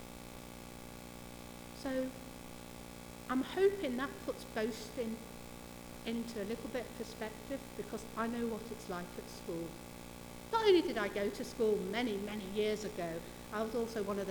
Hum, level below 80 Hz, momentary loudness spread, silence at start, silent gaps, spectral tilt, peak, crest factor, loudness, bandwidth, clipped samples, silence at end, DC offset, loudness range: 60 Hz at -55 dBFS; -60 dBFS; 17 LU; 0 s; none; -5 dB/octave; -18 dBFS; 20 dB; -38 LUFS; over 20 kHz; under 0.1%; 0 s; under 0.1%; 8 LU